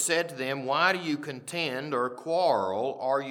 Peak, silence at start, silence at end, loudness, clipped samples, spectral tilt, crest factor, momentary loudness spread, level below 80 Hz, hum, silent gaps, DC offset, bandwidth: -10 dBFS; 0 s; 0 s; -28 LUFS; under 0.1%; -3 dB/octave; 18 dB; 7 LU; -86 dBFS; none; none; under 0.1%; 18 kHz